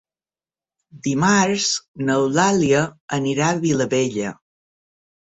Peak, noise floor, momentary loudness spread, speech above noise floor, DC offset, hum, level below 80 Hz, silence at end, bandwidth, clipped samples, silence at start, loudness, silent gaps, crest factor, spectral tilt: -2 dBFS; under -90 dBFS; 8 LU; over 71 dB; under 0.1%; none; -58 dBFS; 1.05 s; 8.4 kHz; under 0.1%; 0.95 s; -19 LUFS; 1.88-1.94 s, 3.01-3.08 s; 18 dB; -4.5 dB/octave